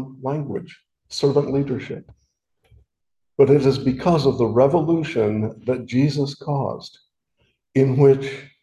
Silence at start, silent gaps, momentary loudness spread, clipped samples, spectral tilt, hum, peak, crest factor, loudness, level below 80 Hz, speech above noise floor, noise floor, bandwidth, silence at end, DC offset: 0 s; none; 16 LU; under 0.1%; -7.5 dB/octave; none; -2 dBFS; 18 dB; -20 LUFS; -52 dBFS; 61 dB; -80 dBFS; 10 kHz; 0.15 s; under 0.1%